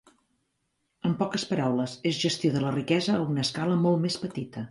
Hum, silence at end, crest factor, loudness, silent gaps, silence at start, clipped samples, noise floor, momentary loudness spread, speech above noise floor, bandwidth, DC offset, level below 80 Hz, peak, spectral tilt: none; 0 s; 18 dB; -27 LUFS; none; 1.05 s; under 0.1%; -77 dBFS; 7 LU; 50 dB; 11.5 kHz; under 0.1%; -66 dBFS; -10 dBFS; -5.5 dB/octave